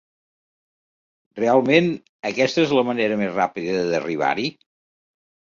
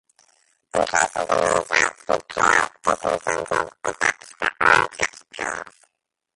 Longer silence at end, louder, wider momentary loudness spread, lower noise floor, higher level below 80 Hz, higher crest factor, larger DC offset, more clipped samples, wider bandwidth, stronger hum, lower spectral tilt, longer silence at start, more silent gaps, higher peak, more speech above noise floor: first, 1.05 s vs 0.65 s; about the same, -21 LUFS vs -21 LUFS; about the same, 10 LU vs 11 LU; first, under -90 dBFS vs -73 dBFS; second, -64 dBFS vs -54 dBFS; about the same, 20 dB vs 22 dB; neither; neither; second, 7.4 kHz vs 11.5 kHz; neither; first, -5.5 dB/octave vs -2 dB/octave; first, 1.35 s vs 0.75 s; first, 2.09-2.23 s vs none; about the same, -2 dBFS vs 0 dBFS; first, over 70 dB vs 53 dB